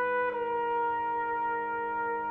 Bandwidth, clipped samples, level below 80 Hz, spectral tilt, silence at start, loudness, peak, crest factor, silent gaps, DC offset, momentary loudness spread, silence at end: 4.2 kHz; under 0.1%; -66 dBFS; -7 dB/octave; 0 s; -31 LUFS; -20 dBFS; 12 dB; none; under 0.1%; 2 LU; 0 s